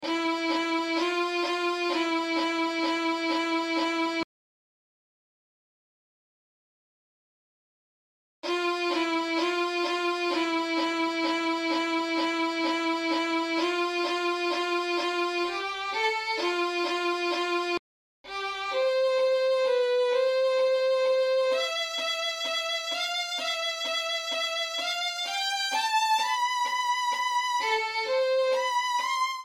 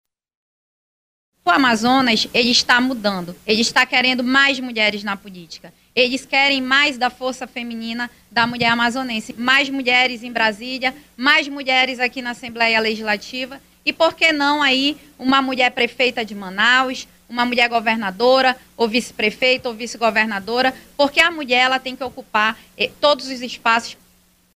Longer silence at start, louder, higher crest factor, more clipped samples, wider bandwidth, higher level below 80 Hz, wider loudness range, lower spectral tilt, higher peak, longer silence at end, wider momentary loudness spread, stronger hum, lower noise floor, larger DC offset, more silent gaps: second, 0 s vs 1.45 s; second, -27 LUFS vs -17 LUFS; about the same, 14 dB vs 16 dB; neither; about the same, 16 kHz vs 15.5 kHz; second, -76 dBFS vs -56 dBFS; about the same, 5 LU vs 3 LU; second, -1 dB/octave vs -2.5 dB/octave; second, -14 dBFS vs -2 dBFS; second, 0 s vs 0.65 s; second, 4 LU vs 12 LU; neither; first, under -90 dBFS vs -56 dBFS; neither; first, 4.24-8.42 s, 17.79-18.24 s vs none